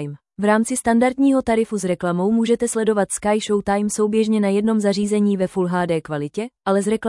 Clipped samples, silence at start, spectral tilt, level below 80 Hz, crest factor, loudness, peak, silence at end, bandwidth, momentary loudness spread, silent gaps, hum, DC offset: under 0.1%; 0 s; -5.5 dB/octave; -52 dBFS; 14 dB; -19 LUFS; -6 dBFS; 0 s; 12 kHz; 5 LU; none; none; under 0.1%